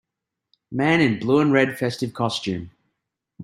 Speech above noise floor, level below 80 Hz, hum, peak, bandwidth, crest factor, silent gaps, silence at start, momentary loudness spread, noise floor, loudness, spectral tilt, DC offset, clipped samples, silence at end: 63 dB; -60 dBFS; none; -4 dBFS; 15.5 kHz; 20 dB; none; 0.7 s; 11 LU; -84 dBFS; -21 LUFS; -6 dB/octave; under 0.1%; under 0.1%; 0 s